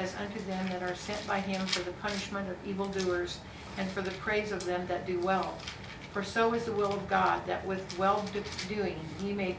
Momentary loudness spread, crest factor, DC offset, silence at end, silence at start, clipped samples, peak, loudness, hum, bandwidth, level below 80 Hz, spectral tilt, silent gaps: 8 LU; 20 dB; under 0.1%; 0 s; 0 s; under 0.1%; -14 dBFS; -33 LUFS; none; 8 kHz; -54 dBFS; -5 dB/octave; none